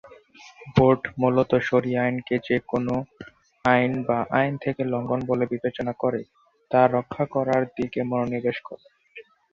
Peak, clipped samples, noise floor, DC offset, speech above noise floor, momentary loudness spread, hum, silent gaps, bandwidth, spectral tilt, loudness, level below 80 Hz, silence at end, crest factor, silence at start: -4 dBFS; under 0.1%; -49 dBFS; under 0.1%; 26 dB; 8 LU; none; none; 7 kHz; -8 dB/octave; -24 LUFS; -54 dBFS; 0.3 s; 20 dB; 0.05 s